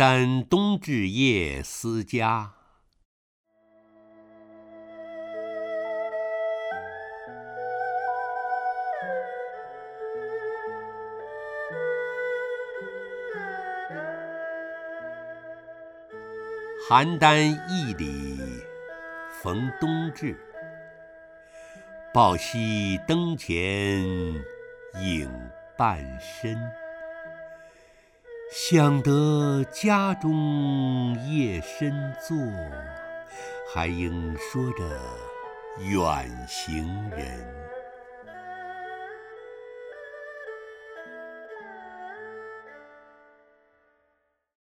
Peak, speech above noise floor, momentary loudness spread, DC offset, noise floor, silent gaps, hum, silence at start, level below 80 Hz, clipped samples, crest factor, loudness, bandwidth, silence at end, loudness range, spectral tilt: -2 dBFS; 48 dB; 20 LU; under 0.1%; -73 dBFS; 3.05-3.44 s; none; 0 s; -48 dBFS; under 0.1%; 26 dB; -27 LUFS; 16 kHz; 1.65 s; 16 LU; -5.5 dB/octave